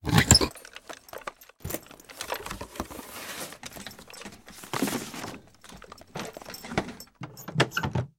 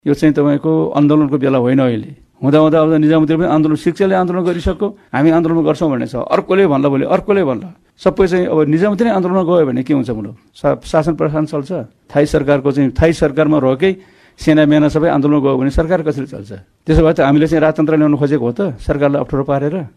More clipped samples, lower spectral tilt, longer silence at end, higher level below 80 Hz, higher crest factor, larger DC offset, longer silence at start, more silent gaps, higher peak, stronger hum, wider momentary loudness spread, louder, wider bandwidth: neither; second, -3.5 dB/octave vs -8 dB/octave; about the same, 0.1 s vs 0.1 s; second, -46 dBFS vs -32 dBFS; first, 30 dB vs 12 dB; neither; about the same, 0.05 s vs 0.05 s; neither; about the same, -2 dBFS vs -2 dBFS; neither; first, 19 LU vs 8 LU; second, -28 LUFS vs -14 LUFS; first, 17.5 kHz vs 11 kHz